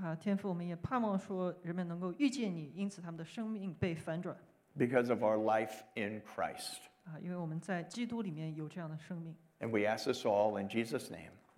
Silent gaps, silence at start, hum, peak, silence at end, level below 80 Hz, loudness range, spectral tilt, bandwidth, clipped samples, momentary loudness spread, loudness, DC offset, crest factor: none; 0 s; none; -18 dBFS; 0.2 s; -74 dBFS; 5 LU; -6 dB/octave; 16 kHz; under 0.1%; 14 LU; -38 LUFS; under 0.1%; 20 dB